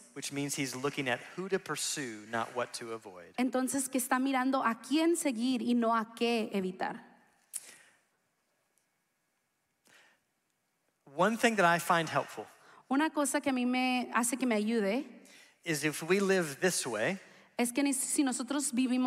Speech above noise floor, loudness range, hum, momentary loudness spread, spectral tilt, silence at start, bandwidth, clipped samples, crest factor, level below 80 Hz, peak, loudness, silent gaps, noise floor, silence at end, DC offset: 48 dB; 8 LU; none; 15 LU; -3.5 dB/octave; 0 s; 16 kHz; under 0.1%; 20 dB; -82 dBFS; -14 dBFS; -31 LUFS; none; -80 dBFS; 0 s; under 0.1%